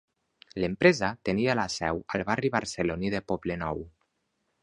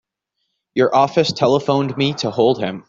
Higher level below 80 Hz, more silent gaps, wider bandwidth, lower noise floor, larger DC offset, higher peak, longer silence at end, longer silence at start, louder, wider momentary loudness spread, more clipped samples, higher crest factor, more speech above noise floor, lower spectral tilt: first, -52 dBFS vs -58 dBFS; neither; first, 11.5 kHz vs 7.6 kHz; about the same, -77 dBFS vs -75 dBFS; neither; about the same, -4 dBFS vs -2 dBFS; first, 0.75 s vs 0.1 s; second, 0.55 s vs 0.75 s; second, -28 LUFS vs -17 LUFS; first, 11 LU vs 5 LU; neither; first, 26 dB vs 16 dB; second, 49 dB vs 58 dB; about the same, -5.5 dB/octave vs -6 dB/octave